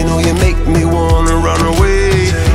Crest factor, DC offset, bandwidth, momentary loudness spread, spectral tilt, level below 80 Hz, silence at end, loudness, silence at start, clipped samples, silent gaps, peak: 10 dB; under 0.1%; 15.5 kHz; 1 LU; -5.5 dB/octave; -16 dBFS; 0 s; -12 LUFS; 0 s; under 0.1%; none; 0 dBFS